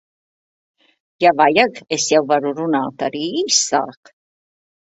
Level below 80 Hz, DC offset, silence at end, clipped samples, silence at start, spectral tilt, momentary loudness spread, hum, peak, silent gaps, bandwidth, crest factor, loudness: -64 dBFS; under 0.1%; 1.05 s; under 0.1%; 1.2 s; -2.5 dB/octave; 8 LU; none; 0 dBFS; none; 8.4 kHz; 20 dB; -17 LUFS